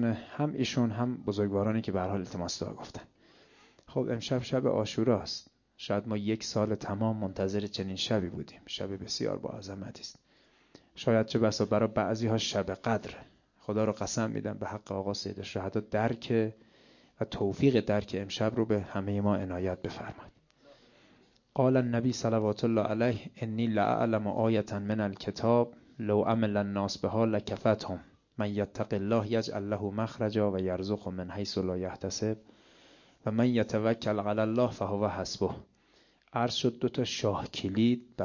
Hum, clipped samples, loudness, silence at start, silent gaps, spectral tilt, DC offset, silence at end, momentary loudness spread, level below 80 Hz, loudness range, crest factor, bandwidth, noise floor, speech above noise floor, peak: none; under 0.1%; -31 LUFS; 0 s; none; -6 dB/octave; under 0.1%; 0 s; 11 LU; -56 dBFS; 4 LU; 20 dB; 7.4 kHz; -65 dBFS; 35 dB; -12 dBFS